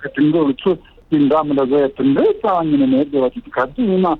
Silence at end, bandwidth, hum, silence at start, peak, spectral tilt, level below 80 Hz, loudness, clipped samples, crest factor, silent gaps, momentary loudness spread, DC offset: 0 s; 4.3 kHz; none; 0 s; -4 dBFS; -9.5 dB/octave; -48 dBFS; -16 LUFS; under 0.1%; 10 dB; none; 6 LU; under 0.1%